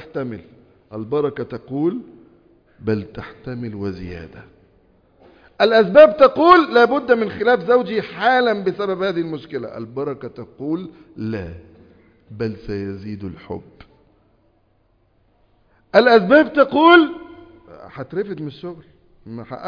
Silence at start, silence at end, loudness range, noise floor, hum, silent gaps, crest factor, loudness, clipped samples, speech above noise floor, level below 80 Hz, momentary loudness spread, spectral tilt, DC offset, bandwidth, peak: 0 s; 0 s; 17 LU; -60 dBFS; none; none; 20 dB; -17 LUFS; under 0.1%; 43 dB; -52 dBFS; 23 LU; -7.5 dB/octave; under 0.1%; 5.2 kHz; 0 dBFS